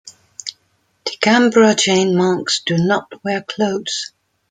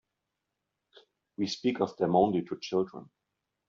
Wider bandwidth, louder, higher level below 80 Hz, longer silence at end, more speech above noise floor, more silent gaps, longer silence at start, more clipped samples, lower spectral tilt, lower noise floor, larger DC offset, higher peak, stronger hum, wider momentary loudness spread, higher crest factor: first, 9.6 kHz vs 7.6 kHz; first, -16 LUFS vs -30 LUFS; first, -62 dBFS vs -70 dBFS; second, 0.45 s vs 0.65 s; second, 47 dB vs 56 dB; neither; second, 0.05 s vs 1.4 s; neither; second, -4 dB/octave vs -5.5 dB/octave; second, -63 dBFS vs -85 dBFS; neither; first, 0 dBFS vs -10 dBFS; neither; first, 18 LU vs 13 LU; second, 16 dB vs 22 dB